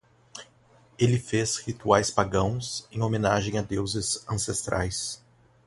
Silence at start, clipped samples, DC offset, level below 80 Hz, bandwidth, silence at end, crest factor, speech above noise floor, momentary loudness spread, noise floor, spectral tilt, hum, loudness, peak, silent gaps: 0.35 s; under 0.1%; under 0.1%; -48 dBFS; 11.5 kHz; 0.5 s; 24 dB; 32 dB; 13 LU; -59 dBFS; -4.5 dB/octave; none; -27 LUFS; -4 dBFS; none